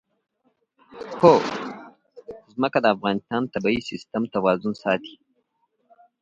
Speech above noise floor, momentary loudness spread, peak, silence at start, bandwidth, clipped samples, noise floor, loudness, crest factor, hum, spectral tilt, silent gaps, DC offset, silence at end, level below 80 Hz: 49 dB; 23 LU; -2 dBFS; 0.95 s; 7.6 kHz; under 0.1%; -71 dBFS; -22 LUFS; 22 dB; none; -6.5 dB/octave; none; under 0.1%; 1.1 s; -62 dBFS